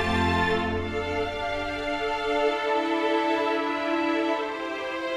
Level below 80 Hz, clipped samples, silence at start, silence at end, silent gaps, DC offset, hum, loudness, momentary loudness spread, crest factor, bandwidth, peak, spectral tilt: -46 dBFS; under 0.1%; 0 s; 0 s; none; under 0.1%; none; -26 LUFS; 5 LU; 14 dB; 13 kHz; -12 dBFS; -5.5 dB/octave